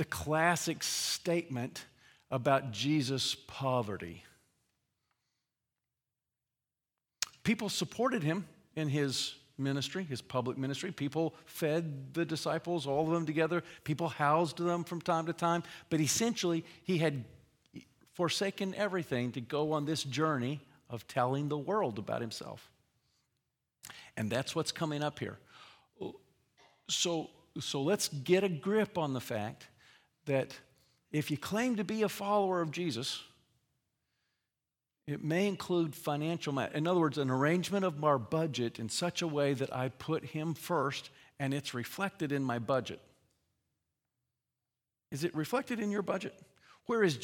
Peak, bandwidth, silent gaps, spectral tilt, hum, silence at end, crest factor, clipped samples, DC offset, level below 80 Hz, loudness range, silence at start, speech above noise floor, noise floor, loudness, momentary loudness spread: -14 dBFS; 18 kHz; none; -4.5 dB/octave; none; 0 s; 22 dB; under 0.1%; under 0.1%; -74 dBFS; 7 LU; 0 s; over 56 dB; under -90 dBFS; -34 LUFS; 13 LU